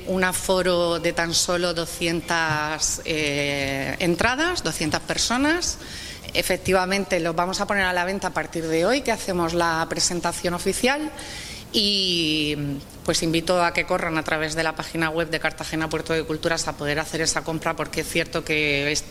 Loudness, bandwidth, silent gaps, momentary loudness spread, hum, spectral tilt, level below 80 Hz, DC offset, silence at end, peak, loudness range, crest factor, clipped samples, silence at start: -23 LUFS; 16 kHz; none; 6 LU; none; -3 dB/octave; -44 dBFS; under 0.1%; 0 s; -4 dBFS; 2 LU; 20 dB; under 0.1%; 0 s